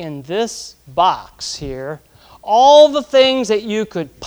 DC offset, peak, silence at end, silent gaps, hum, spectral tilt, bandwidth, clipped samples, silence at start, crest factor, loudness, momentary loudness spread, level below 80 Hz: under 0.1%; 0 dBFS; 0 s; none; none; -3.5 dB/octave; over 20 kHz; under 0.1%; 0 s; 16 dB; -14 LUFS; 20 LU; -48 dBFS